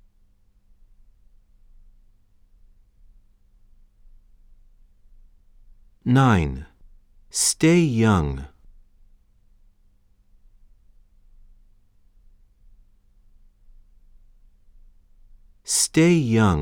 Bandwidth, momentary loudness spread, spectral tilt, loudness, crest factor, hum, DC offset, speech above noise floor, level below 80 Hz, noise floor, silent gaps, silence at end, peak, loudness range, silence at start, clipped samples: 17.5 kHz; 17 LU; -5 dB/octave; -20 LUFS; 22 dB; none; under 0.1%; 39 dB; -44 dBFS; -58 dBFS; none; 0 s; -6 dBFS; 8 LU; 6.05 s; under 0.1%